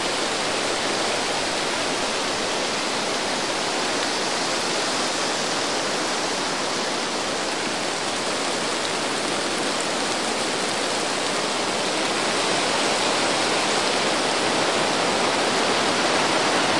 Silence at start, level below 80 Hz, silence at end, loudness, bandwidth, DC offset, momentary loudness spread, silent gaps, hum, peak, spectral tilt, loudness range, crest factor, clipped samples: 0 s; -58 dBFS; 0 s; -22 LUFS; 11.5 kHz; 0.5%; 3 LU; none; none; -8 dBFS; -1.5 dB/octave; 3 LU; 16 dB; under 0.1%